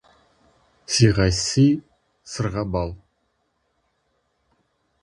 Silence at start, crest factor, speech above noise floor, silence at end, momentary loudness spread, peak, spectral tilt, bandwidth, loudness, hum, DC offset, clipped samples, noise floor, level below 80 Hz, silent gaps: 0.9 s; 22 dB; 51 dB; 2.05 s; 11 LU; -2 dBFS; -5 dB/octave; 11.5 kHz; -21 LUFS; none; under 0.1%; under 0.1%; -71 dBFS; -40 dBFS; none